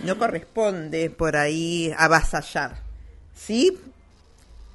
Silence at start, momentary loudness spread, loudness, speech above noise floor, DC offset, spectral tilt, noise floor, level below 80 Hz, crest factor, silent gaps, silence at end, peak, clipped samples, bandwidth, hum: 0 s; 18 LU; -23 LUFS; 30 dB; under 0.1%; -4.5 dB/octave; -52 dBFS; -38 dBFS; 24 dB; none; 0.1 s; 0 dBFS; under 0.1%; 11.5 kHz; none